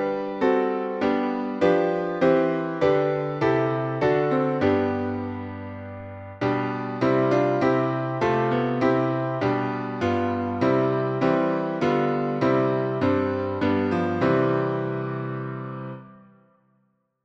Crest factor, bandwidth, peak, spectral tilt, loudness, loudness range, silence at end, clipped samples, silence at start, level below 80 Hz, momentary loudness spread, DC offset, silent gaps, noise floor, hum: 16 dB; 7.6 kHz; -8 dBFS; -8.5 dB/octave; -24 LUFS; 3 LU; 1.1 s; under 0.1%; 0 s; -58 dBFS; 10 LU; under 0.1%; none; -69 dBFS; none